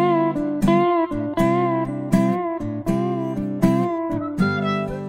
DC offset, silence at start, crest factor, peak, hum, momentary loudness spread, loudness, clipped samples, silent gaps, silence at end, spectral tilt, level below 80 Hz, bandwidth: under 0.1%; 0 s; 16 dB; -4 dBFS; none; 6 LU; -21 LUFS; under 0.1%; none; 0 s; -8 dB/octave; -40 dBFS; 16 kHz